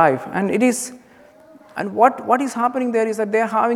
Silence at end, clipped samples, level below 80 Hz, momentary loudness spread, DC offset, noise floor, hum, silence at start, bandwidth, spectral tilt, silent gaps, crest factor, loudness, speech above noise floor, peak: 0 s; under 0.1%; -68 dBFS; 10 LU; under 0.1%; -48 dBFS; none; 0 s; 15 kHz; -5 dB/octave; none; 20 dB; -19 LUFS; 29 dB; 0 dBFS